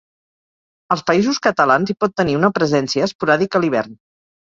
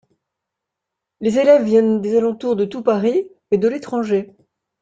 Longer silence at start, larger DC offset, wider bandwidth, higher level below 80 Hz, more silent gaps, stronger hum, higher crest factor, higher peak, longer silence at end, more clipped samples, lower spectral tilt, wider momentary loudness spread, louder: second, 0.9 s vs 1.2 s; neither; about the same, 7.8 kHz vs 7.8 kHz; first, -54 dBFS vs -62 dBFS; first, 3.15-3.19 s vs none; neither; about the same, 18 dB vs 16 dB; about the same, 0 dBFS vs -2 dBFS; about the same, 0.55 s vs 0.55 s; neither; second, -5.5 dB/octave vs -7 dB/octave; second, 5 LU vs 10 LU; about the same, -17 LUFS vs -18 LUFS